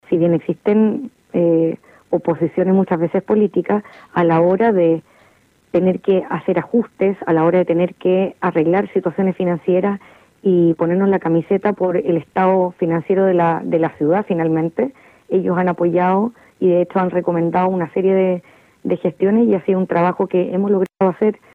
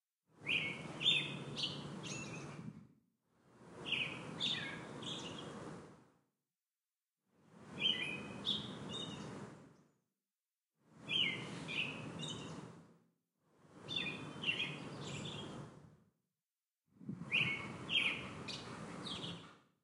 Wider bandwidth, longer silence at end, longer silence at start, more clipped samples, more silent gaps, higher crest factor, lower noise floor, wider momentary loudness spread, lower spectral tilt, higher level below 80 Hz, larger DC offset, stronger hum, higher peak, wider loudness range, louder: second, 4.3 kHz vs 12 kHz; about the same, 0.2 s vs 0.25 s; second, 0.1 s vs 0.35 s; neither; neither; second, 10 dB vs 24 dB; second, -54 dBFS vs under -90 dBFS; second, 6 LU vs 18 LU; first, -10 dB/octave vs -3 dB/octave; first, -60 dBFS vs -76 dBFS; neither; neither; first, -6 dBFS vs -22 dBFS; second, 1 LU vs 5 LU; first, -17 LUFS vs -40 LUFS